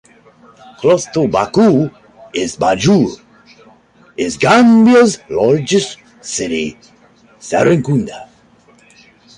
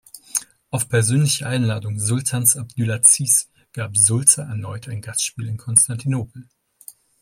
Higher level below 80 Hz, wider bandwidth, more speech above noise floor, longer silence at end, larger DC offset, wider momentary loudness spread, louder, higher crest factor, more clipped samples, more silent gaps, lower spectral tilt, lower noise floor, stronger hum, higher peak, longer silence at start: first, -48 dBFS vs -58 dBFS; second, 11 kHz vs 16.5 kHz; first, 36 dB vs 26 dB; first, 1.15 s vs 0.3 s; neither; about the same, 17 LU vs 16 LU; first, -13 LUFS vs -17 LUFS; second, 14 dB vs 20 dB; neither; neither; first, -5.5 dB/octave vs -3.5 dB/octave; about the same, -48 dBFS vs -46 dBFS; neither; about the same, 0 dBFS vs 0 dBFS; first, 0.8 s vs 0.15 s